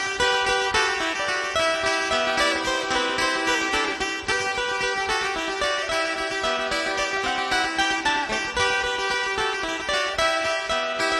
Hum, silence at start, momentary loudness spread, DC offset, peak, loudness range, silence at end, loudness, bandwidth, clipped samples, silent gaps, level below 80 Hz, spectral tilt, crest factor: none; 0 s; 3 LU; under 0.1%; -6 dBFS; 2 LU; 0 s; -23 LUFS; 13 kHz; under 0.1%; none; -48 dBFS; -1.5 dB/octave; 18 dB